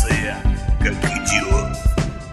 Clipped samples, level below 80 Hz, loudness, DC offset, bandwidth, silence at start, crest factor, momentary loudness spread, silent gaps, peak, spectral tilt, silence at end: under 0.1%; -22 dBFS; -20 LUFS; under 0.1%; 12.5 kHz; 0 s; 16 dB; 4 LU; none; -2 dBFS; -4.5 dB/octave; 0 s